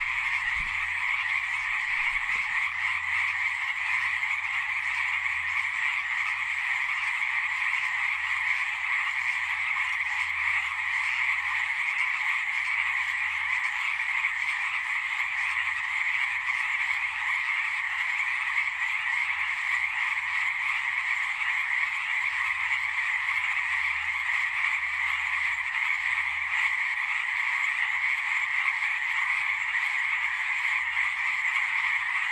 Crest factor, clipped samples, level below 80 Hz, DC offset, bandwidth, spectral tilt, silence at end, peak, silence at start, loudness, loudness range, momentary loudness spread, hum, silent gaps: 16 dB; under 0.1%; -62 dBFS; under 0.1%; 14.5 kHz; 1.5 dB/octave; 0 s; -12 dBFS; 0 s; -26 LUFS; 1 LU; 2 LU; none; none